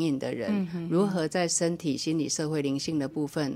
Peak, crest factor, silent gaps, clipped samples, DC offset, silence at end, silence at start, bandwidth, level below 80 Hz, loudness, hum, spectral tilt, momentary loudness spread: -14 dBFS; 14 dB; none; under 0.1%; under 0.1%; 0 s; 0 s; 15.5 kHz; -66 dBFS; -28 LUFS; none; -4.5 dB/octave; 4 LU